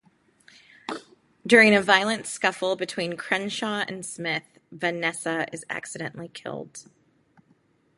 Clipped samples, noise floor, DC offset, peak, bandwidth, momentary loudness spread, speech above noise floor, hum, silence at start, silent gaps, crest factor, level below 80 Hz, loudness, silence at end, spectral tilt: under 0.1%; -64 dBFS; under 0.1%; -2 dBFS; 11.5 kHz; 21 LU; 39 dB; none; 0.9 s; none; 24 dB; -72 dBFS; -24 LUFS; 1.15 s; -3.5 dB/octave